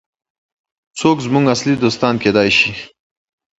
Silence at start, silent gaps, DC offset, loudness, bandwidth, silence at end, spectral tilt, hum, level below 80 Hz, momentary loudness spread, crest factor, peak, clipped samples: 0.95 s; none; under 0.1%; -14 LUFS; 8 kHz; 0.75 s; -5 dB/octave; none; -50 dBFS; 6 LU; 16 dB; 0 dBFS; under 0.1%